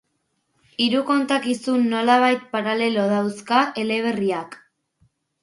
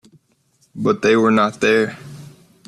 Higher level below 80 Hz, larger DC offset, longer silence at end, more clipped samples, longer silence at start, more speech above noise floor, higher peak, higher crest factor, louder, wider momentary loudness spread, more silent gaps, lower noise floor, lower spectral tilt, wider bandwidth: second, -70 dBFS vs -58 dBFS; neither; first, 0.9 s vs 0.4 s; neither; about the same, 0.8 s vs 0.75 s; first, 51 dB vs 45 dB; about the same, -4 dBFS vs -2 dBFS; about the same, 18 dB vs 16 dB; second, -21 LUFS vs -17 LUFS; second, 7 LU vs 16 LU; neither; first, -72 dBFS vs -61 dBFS; about the same, -5 dB/octave vs -5.5 dB/octave; about the same, 11.5 kHz vs 12 kHz